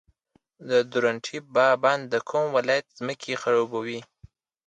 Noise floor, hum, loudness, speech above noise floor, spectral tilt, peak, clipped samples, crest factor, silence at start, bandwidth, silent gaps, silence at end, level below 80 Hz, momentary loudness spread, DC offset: -67 dBFS; none; -25 LUFS; 42 dB; -4.5 dB/octave; -6 dBFS; under 0.1%; 20 dB; 0.6 s; 9.2 kHz; none; 0.65 s; -68 dBFS; 12 LU; under 0.1%